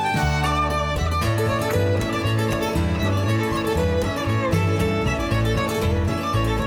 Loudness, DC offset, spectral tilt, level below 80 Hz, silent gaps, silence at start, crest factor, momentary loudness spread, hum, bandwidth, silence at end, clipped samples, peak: -22 LUFS; under 0.1%; -6 dB/octave; -32 dBFS; none; 0 s; 14 dB; 2 LU; none; 17.5 kHz; 0 s; under 0.1%; -8 dBFS